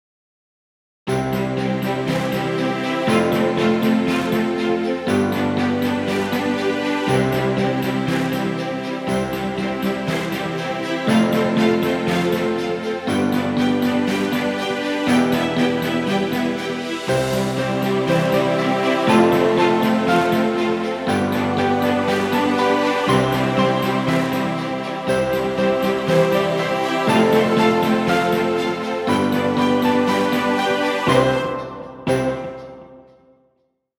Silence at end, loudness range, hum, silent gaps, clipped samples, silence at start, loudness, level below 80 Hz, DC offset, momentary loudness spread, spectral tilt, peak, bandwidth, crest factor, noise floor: 1 s; 4 LU; none; none; under 0.1%; 1.05 s; -19 LUFS; -50 dBFS; under 0.1%; 6 LU; -6 dB/octave; -2 dBFS; 20 kHz; 18 dB; -67 dBFS